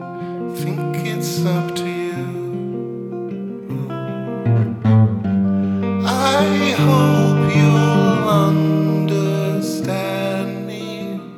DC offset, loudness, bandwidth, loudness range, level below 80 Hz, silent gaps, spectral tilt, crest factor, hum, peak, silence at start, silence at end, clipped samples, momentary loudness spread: under 0.1%; -18 LUFS; 15.5 kHz; 8 LU; -58 dBFS; none; -6.5 dB/octave; 14 dB; none; -2 dBFS; 0 s; 0 s; under 0.1%; 13 LU